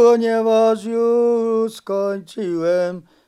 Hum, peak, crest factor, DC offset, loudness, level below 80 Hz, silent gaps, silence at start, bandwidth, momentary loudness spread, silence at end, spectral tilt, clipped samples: none; -4 dBFS; 14 dB; under 0.1%; -18 LUFS; -72 dBFS; none; 0 s; 12.5 kHz; 9 LU; 0.3 s; -6 dB/octave; under 0.1%